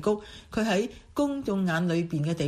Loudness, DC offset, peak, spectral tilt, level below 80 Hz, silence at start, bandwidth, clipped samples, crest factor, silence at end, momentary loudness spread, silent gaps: -28 LUFS; under 0.1%; -12 dBFS; -6.5 dB/octave; -54 dBFS; 0 s; 14 kHz; under 0.1%; 14 dB; 0 s; 6 LU; none